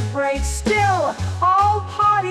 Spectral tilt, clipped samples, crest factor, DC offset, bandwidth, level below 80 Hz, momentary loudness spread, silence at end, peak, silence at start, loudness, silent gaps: -5 dB/octave; under 0.1%; 12 dB; under 0.1%; 14 kHz; -32 dBFS; 6 LU; 0 s; -8 dBFS; 0 s; -18 LUFS; none